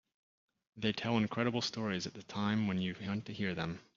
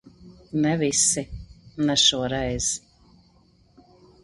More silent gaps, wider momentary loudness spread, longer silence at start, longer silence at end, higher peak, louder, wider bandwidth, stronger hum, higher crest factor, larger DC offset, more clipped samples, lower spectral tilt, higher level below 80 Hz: neither; second, 7 LU vs 18 LU; first, 0.75 s vs 0.05 s; second, 0.15 s vs 1.45 s; second, -16 dBFS vs -6 dBFS; second, -36 LUFS vs -22 LUFS; second, 7.4 kHz vs 11.5 kHz; neither; about the same, 20 dB vs 20 dB; neither; neither; first, -4.5 dB/octave vs -2.5 dB/octave; second, -70 dBFS vs -46 dBFS